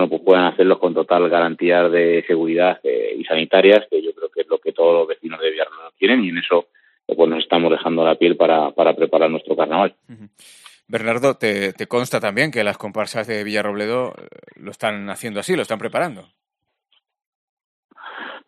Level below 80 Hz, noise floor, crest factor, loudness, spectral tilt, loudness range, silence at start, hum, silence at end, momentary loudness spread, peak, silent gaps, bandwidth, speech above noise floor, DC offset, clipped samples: -70 dBFS; -78 dBFS; 18 dB; -18 LUFS; -5 dB/octave; 9 LU; 0 s; none; 0.1 s; 11 LU; 0 dBFS; 17.26-17.57 s, 17.64-17.89 s; 13.5 kHz; 61 dB; under 0.1%; under 0.1%